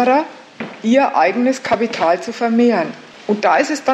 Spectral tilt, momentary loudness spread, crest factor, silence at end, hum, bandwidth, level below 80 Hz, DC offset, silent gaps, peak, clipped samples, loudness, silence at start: -4.5 dB/octave; 14 LU; 14 dB; 0 s; none; 8.8 kHz; -64 dBFS; under 0.1%; none; -2 dBFS; under 0.1%; -16 LUFS; 0 s